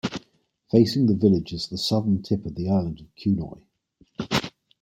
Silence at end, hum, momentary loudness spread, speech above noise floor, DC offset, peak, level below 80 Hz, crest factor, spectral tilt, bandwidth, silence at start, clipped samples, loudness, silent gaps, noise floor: 0.35 s; none; 17 LU; 40 dB; under 0.1%; -4 dBFS; -52 dBFS; 20 dB; -6.5 dB/octave; 16 kHz; 0.05 s; under 0.1%; -24 LUFS; none; -63 dBFS